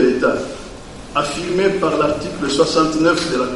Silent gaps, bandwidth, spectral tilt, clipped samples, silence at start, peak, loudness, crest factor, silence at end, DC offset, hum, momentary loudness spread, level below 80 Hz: none; 11.5 kHz; -4.5 dB/octave; under 0.1%; 0 s; 0 dBFS; -17 LUFS; 16 dB; 0 s; under 0.1%; none; 14 LU; -42 dBFS